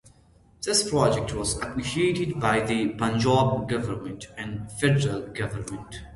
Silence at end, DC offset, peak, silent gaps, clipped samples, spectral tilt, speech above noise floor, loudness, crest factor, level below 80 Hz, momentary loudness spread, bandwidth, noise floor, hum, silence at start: 0 s; under 0.1%; -8 dBFS; none; under 0.1%; -5 dB/octave; 32 dB; -25 LUFS; 18 dB; -48 dBFS; 13 LU; 11.5 kHz; -57 dBFS; none; 0.6 s